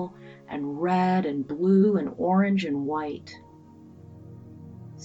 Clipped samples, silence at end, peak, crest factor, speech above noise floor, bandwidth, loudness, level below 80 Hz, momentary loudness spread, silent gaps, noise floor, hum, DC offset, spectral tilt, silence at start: under 0.1%; 0 s; -10 dBFS; 16 dB; 25 dB; 7.6 kHz; -25 LUFS; -66 dBFS; 24 LU; none; -49 dBFS; none; under 0.1%; -8.5 dB/octave; 0 s